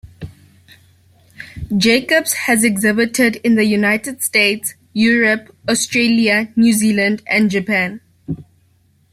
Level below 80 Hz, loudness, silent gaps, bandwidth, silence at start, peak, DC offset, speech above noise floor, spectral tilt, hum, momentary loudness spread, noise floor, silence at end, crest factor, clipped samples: -48 dBFS; -15 LUFS; none; 16 kHz; 0.05 s; -2 dBFS; under 0.1%; 41 dB; -3.5 dB/octave; none; 16 LU; -56 dBFS; 0.7 s; 16 dB; under 0.1%